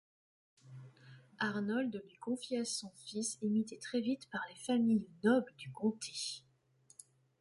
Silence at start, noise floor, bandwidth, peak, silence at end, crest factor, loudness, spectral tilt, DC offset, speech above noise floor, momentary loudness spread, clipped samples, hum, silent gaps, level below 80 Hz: 0.65 s; -69 dBFS; 11.5 kHz; -20 dBFS; 1 s; 18 dB; -37 LUFS; -4.5 dB/octave; under 0.1%; 33 dB; 23 LU; under 0.1%; none; none; -82 dBFS